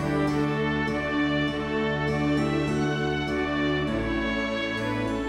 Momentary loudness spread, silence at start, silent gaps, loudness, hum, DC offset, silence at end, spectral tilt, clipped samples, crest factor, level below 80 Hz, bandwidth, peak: 2 LU; 0 s; none; -26 LUFS; none; under 0.1%; 0 s; -6.5 dB/octave; under 0.1%; 12 dB; -42 dBFS; 12 kHz; -12 dBFS